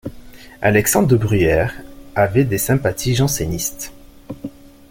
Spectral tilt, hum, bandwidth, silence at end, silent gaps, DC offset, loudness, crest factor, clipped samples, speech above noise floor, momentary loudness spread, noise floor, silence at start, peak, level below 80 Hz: -5 dB/octave; none; 17 kHz; 0.4 s; none; under 0.1%; -17 LUFS; 18 dB; under 0.1%; 22 dB; 18 LU; -38 dBFS; 0.05 s; -2 dBFS; -38 dBFS